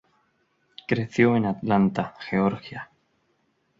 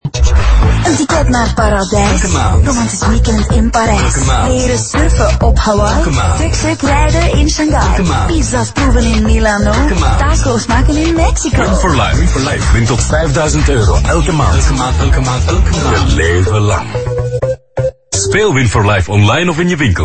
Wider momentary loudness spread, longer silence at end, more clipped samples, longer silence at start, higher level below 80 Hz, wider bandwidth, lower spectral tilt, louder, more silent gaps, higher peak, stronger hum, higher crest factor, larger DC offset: first, 19 LU vs 2 LU; first, 0.95 s vs 0 s; neither; first, 0.9 s vs 0.05 s; second, -58 dBFS vs -14 dBFS; second, 7.6 kHz vs 8.8 kHz; first, -8 dB/octave vs -5 dB/octave; second, -24 LUFS vs -11 LUFS; neither; second, -6 dBFS vs 0 dBFS; neither; first, 20 dB vs 10 dB; neither